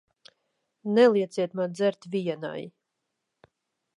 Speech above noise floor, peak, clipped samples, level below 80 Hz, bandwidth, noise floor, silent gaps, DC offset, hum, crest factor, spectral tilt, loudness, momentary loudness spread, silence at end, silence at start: 57 dB; -8 dBFS; under 0.1%; -82 dBFS; 11 kHz; -82 dBFS; none; under 0.1%; none; 20 dB; -6.5 dB/octave; -26 LUFS; 18 LU; 1.3 s; 0.85 s